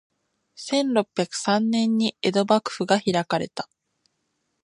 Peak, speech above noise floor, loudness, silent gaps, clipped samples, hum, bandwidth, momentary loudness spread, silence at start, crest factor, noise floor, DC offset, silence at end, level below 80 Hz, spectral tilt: -4 dBFS; 52 dB; -23 LUFS; none; under 0.1%; none; 11 kHz; 10 LU; 0.6 s; 20 dB; -75 dBFS; under 0.1%; 1 s; -68 dBFS; -4.5 dB/octave